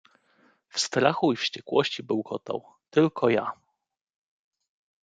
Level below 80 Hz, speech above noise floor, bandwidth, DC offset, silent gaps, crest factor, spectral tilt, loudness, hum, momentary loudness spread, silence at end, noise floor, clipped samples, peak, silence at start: -72 dBFS; 54 dB; 9.4 kHz; under 0.1%; none; 24 dB; -4.5 dB/octave; -26 LUFS; none; 11 LU; 1.5 s; -80 dBFS; under 0.1%; -6 dBFS; 0.75 s